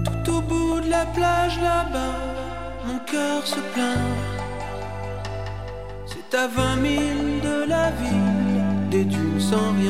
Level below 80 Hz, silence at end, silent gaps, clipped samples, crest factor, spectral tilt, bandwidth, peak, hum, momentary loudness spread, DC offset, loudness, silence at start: -36 dBFS; 0 s; none; under 0.1%; 16 dB; -5.5 dB/octave; 16 kHz; -6 dBFS; none; 10 LU; 1%; -23 LUFS; 0 s